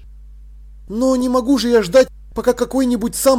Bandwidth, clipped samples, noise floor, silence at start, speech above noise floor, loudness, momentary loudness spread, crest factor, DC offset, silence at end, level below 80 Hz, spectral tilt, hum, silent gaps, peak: 17 kHz; under 0.1%; -38 dBFS; 0 s; 23 dB; -16 LUFS; 7 LU; 14 dB; under 0.1%; 0 s; -38 dBFS; -4 dB/octave; none; none; -4 dBFS